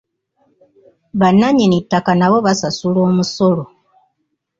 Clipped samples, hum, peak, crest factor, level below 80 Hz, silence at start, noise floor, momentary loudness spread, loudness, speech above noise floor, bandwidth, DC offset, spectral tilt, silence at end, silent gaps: under 0.1%; none; -2 dBFS; 14 dB; -52 dBFS; 1.15 s; -70 dBFS; 7 LU; -14 LUFS; 56 dB; 7.6 kHz; under 0.1%; -6 dB/octave; 0.95 s; none